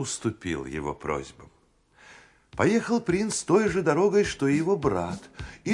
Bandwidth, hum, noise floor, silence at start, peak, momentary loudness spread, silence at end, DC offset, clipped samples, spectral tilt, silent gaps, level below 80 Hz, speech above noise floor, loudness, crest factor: 11.5 kHz; none; -63 dBFS; 0 s; -8 dBFS; 13 LU; 0 s; under 0.1%; under 0.1%; -5.5 dB/octave; none; -52 dBFS; 37 dB; -26 LUFS; 18 dB